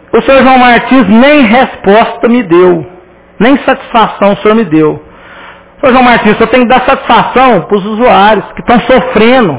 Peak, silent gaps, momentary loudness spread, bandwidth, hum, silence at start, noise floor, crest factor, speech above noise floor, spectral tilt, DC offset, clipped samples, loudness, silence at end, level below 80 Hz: 0 dBFS; none; 5 LU; 4 kHz; none; 0.15 s; -31 dBFS; 6 dB; 26 dB; -9.5 dB/octave; under 0.1%; 7%; -6 LUFS; 0 s; -34 dBFS